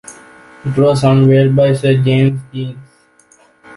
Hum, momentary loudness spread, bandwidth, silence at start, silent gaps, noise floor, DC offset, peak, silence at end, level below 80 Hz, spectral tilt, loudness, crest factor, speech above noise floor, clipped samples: none; 15 LU; 11.5 kHz; 0.1 s; none; -50 dBFS; under 0.1%; -2 dBFS; 0 s; -48 dBFS; -7.5 dB/octave; -12 LUFS; 12 dB; 39 dB; under 0.1%